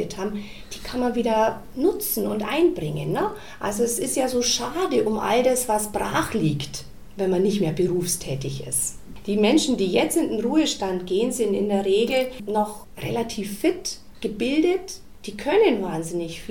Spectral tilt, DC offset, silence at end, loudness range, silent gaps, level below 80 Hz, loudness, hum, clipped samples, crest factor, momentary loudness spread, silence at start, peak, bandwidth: -4.5 dB/octave; 0.8%; 0 s; 2 LU; none; -46 dBFS; -23 LUFS; none; under 0.1%; 16 dB; 11 LU; 0 s; -8 dBFS; 18 kHz